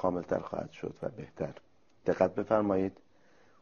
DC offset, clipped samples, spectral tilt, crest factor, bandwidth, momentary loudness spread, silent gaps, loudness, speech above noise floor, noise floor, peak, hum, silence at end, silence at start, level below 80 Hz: under 0.1%; under 0.1%; -7 dB/octave; 22 dB; 7 kHz; 12 LU; none; -33 LUFS; 33 dB; -65 dBFS; -10 dBFS; none; 0.7 s; 0 s; -62 dBFS